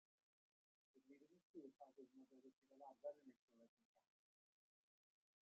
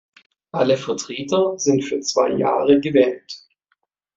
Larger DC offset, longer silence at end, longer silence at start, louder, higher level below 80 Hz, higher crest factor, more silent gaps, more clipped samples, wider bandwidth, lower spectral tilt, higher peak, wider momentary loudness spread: neither; first, 1.55 s vs 0.8 s; first, 0.95 s vs 0.55 s; second, -62 LUFS vs -19 LUFS; second, under -90 dBFS vs -62 dBFS; first, 24 dB vs 18 dB; first, 1.43-1.54 s, 2.56-2.62 s, 3.39-3.48 s, 3.69-3.77 s, 3.85-3.95 s vs none; neither; second, 6.8 kHz vs 8 kHz; about the same, -5.5 dB/octave vs -4.5 dB/octave; second, -42 dBFS vs -2 dBFS; second, 10 LU vs 14 LU